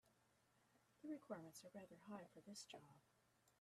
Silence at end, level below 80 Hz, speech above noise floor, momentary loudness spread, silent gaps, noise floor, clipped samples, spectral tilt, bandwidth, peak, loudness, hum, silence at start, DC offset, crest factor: 0.05 s; under -90 dBFS; 21 dB; 7 LU; none; -81 dBFS; under 0.1%; -4.5 dB/octave; 13.5 kHz; -40 dBFS; -58 LUFS; none; 0.05 s; under 0.1%; 20 dB